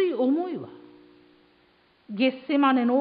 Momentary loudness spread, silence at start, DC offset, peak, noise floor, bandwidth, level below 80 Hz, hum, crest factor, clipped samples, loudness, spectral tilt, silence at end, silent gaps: 17 LU; 0 s; under 0.1%; -10 dBFS; -62 dBFS; 5 kHz; -78 dBFS; none; 16 dB; under 0.1%; -24 LUFS; -9.5 dB/octave; 0 s; none